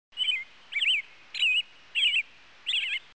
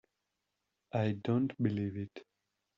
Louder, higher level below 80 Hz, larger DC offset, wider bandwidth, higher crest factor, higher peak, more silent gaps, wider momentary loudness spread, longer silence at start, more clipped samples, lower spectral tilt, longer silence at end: first, -26 LUFS vs -35 LUFS; about the same, -78 dBFS vs -74 dBFS; first, 0.2% vs under 0.1%; first, 8 kHz vs 7 kHz; second, 14 dB vs 20 dB; about the same, -16 dBFS vs -18 dBFS; neither; about the same, 11 LU vs 13 LU; second, 0.15 s vs 0.95 s; neither; second, 3 dB/octave vs -8 dB/octave; second, 0.15 s vs 0.55 s